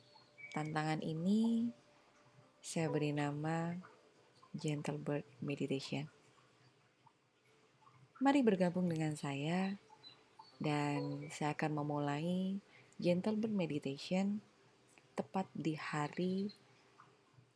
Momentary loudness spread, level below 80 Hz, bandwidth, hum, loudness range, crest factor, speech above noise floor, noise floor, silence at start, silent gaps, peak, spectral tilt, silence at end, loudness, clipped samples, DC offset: 12 LU; -84 dBFS; 12 kHz; none; 6 LU; 20 dB; 35 dB; -72 dBFS; 0.4 s; none; -20 dBFS; -6.5 dB/octave; 1.05 s; -39 LUFS; under 0.1%; under 0.1%